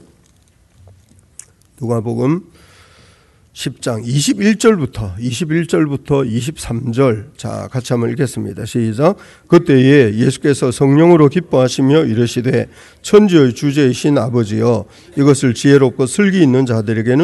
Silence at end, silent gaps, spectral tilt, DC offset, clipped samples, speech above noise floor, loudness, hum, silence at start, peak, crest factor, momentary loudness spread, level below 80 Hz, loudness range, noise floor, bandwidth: 0 s; none; -6.5 dB/octave; under 0.1%; 0.3%; 39 dB; -14 LUFS; none; 1.8 s; 0 dBFS; 14 dB; 13 LU; -46 dBFS; 8 LU; -52 dBFS; 12.5 kHz